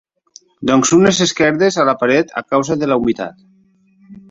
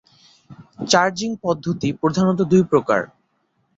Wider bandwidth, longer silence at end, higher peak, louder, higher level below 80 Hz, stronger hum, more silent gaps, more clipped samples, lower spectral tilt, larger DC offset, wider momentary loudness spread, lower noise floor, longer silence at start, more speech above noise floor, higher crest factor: about the same, 8 kHz vs 8 kHz; second, 0.1 s vs 0.7 s; about the same, 0 dBFS vs -2 dBFS; first, -14 LUFS vs -19 LUFS; first, -50 dBFS vs -56 dBFS; neither; neither; neither; about the same, -4 dB/octave vs -5 dB/octave; neither; about the same, 9 LU vs 8 LU; second, -54 dBFS vs -67 dBFS; about the same, 0.6 s vs 0.5 s; second, 40 dB vs 49 dB; about the same, 14 dB vs 18 dB